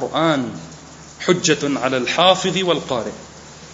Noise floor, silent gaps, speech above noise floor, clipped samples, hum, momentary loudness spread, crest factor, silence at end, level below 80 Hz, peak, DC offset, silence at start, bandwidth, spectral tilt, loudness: -39 dBFS; none; 21 dB; under 0.1%; none; 24 LU; 20 dB; 0 s; -52 dBFS; 0 dBFS; under 0.1%; 0 s; 8 kHz; -3.5 dB/octave; -18 LUFS